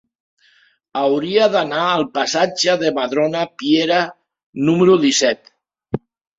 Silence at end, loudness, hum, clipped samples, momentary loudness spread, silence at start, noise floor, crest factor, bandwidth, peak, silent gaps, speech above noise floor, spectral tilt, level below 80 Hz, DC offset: 0.4 s; -17 LUFS; none; under 0.1%; 15 LU; 0.95 s; -56 dBFS; 16 dB; 7.8 kHz; -2 dBFS; 4.46-4.53 s; 40 dB; -4 dB/octave; -60 dBFS; under 0.1%